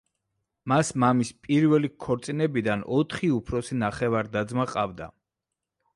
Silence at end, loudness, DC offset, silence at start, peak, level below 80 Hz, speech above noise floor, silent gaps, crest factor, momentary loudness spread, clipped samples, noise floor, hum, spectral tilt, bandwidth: 0.9 s; -26 LUFS; under 0.1%; 0.65 s; -8 dBFS; -54 dBFS; 61 dB; none; 18 dB; 8 LU; under 0.1%; -86 dBFS; none; -6.5 dB/octave; 11.5 kHz